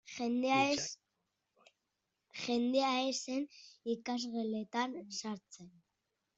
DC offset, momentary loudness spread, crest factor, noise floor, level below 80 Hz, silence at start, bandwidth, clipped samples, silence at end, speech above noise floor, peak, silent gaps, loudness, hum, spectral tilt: under 0.1%; 16 LU; 20 dB; -86 dBFS; -80 dBFS; 0.05 s; 8.2 kHz; under 0.1%; 0.7 s; 50 dB; -18 dBFS; none; -36 LUFS; none; -3 dB/octave